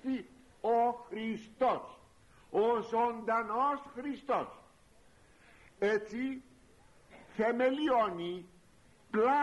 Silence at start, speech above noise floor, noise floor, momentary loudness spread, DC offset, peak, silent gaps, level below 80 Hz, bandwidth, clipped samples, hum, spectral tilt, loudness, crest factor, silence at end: 0.05 s; 32 dB; -64 dBFS; 11 LU; under 0.1%; -20 dBFS; none; -68 dBFS; 11.5 kHz; under 0.1%; none; -6 dB/octave; -33 LUFS; 16 dB; 0 s